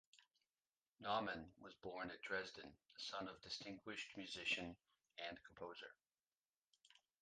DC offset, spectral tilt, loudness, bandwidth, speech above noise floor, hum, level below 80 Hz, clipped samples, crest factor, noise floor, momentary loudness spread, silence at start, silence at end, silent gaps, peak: under 0.1%; -3 dB/octave; -49 LUFS; 9.4 kHz; over 40 dB; none; -80 dBFS; under 0.1%; 22 dB; under -90 dBFS; 16 LU; 0.15 s; 0.25 s; 0.78-0.82 s, 0.89-0.95 s, 6.27-6.31 s, 6.38-6.42 s, 6.49-6.68 s; -30 dBFS